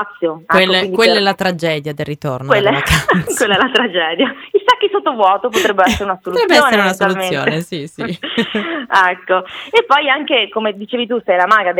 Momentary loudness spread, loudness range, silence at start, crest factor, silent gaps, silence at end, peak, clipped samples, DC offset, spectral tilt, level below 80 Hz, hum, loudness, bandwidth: 9 LU; 2 LU; 0 s; 14 dB; none; 0 s; 0 dBFS; under 0.1%; under 0.1%; -4 dB/octave; -40 dBFS; none; -14 LUFS; 19 kHz